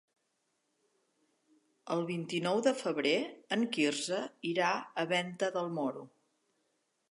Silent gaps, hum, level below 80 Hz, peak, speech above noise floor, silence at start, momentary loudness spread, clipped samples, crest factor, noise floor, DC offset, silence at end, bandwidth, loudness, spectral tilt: none; none; -88 dBFS; -14 dBFS; 47 dB; 1.85 s; 6 LU; under 0.1%; 20 dB; -80 dBFS; under 0.1%; 1.05 s; 11.5 kHz; -33 LUFS; -4 dB/octave